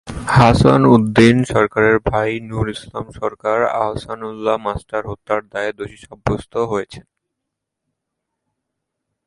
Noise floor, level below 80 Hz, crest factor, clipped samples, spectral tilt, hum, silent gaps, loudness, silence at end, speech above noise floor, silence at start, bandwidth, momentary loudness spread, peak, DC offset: -79 dBFS; -38 dBFS; 18 dB; under 0.1%; -7 dB/octave; none; none; -17 LUFS; 2.25 s; 63 dB; 0.05 s; 11.5 kHz; 15 LU; 0 dBFS; under 0.1%